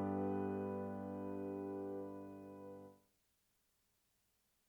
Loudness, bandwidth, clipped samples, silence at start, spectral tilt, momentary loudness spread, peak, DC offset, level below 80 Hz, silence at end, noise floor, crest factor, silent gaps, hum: -45 LUFS; 20 kHz; under 0.1%; 0 s; -9.5 dB/octave; 14 LU; -30 dBFS; under 0.1%; -84 dBFS; 1.7 s; -81 dBFS; 16 dB; none; none